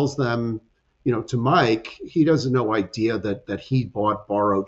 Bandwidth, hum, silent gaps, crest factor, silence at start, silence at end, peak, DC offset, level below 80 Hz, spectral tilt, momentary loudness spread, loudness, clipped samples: 8 kHz; none; none; 16 dB; 0 s; 0 s; -6 dBFS; under 0.1%; -54 dBFS; -7 dB/octave; 9 LU; -23 LUFS; under 0.1%